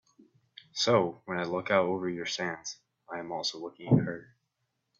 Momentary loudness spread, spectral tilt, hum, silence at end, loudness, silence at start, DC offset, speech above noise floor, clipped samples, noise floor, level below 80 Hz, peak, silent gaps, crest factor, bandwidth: 15 LU; -5 dB/octave; none; 0.75 s; -30 LUFS; 0.75 s; under 0.1%; 51 dB; under 0.1%; -81 dBFS; -70 dBFS; -10 dBFS; none; 22 dB; 7.8 kHz